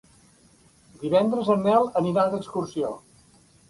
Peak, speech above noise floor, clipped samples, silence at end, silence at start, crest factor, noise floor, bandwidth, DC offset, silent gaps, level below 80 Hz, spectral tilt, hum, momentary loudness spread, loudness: -8 dBFS; 34 dB; under 0.1%; 0.7 s; 1 s; 18 dB; -57 dBFS; 11.5 kHz; under 0.1%; none; -62 dBFS; -7 dB/octave; none; 11 LU; -24 LUFS